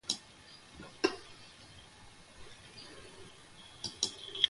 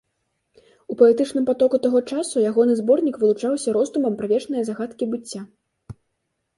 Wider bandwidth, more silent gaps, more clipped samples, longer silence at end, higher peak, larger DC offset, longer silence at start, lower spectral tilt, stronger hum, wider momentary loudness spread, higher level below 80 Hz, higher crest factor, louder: about the same, 11.5 kHz vs 11.5 kHz; neither; neither; second, 0 s vs 0.65 s; second, -10 dBFS vs -4 dBFS; neither; second, 0.05 s vs 0.9 s; second, -1.5 dB/octave vs -5.5 dB/octave; neither; first, 19 LU vs 11 LU; about the same, -66 dBFS vs -64 dBFS; first, 30 dB vs 18 dB; second, -39 LUFS vs -20 LUFS